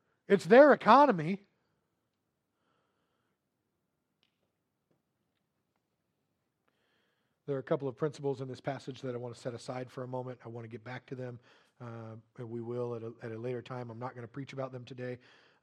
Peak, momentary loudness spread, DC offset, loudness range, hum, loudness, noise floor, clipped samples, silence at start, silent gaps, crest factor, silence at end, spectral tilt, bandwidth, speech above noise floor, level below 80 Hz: -8 dBFS; 23 LU; under 0.1%; 16 LU; none; -30 LUFS; -83 dBFS; under 0.1%; 0.3 s; none; 26 dB; 0.45 s; -7 dB/octave; 10.5 kHz; 52 dB; -82 dBFS